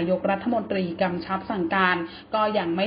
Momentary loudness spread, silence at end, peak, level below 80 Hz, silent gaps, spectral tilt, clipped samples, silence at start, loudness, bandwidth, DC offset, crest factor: 7 LU; 0 s; -6 dBFS; -56 dBFS; none; -10.5 dB/octave; under 0.1%; 0 s; -25 LUFS; 5.2 kHz; under 0.1%; 18 dB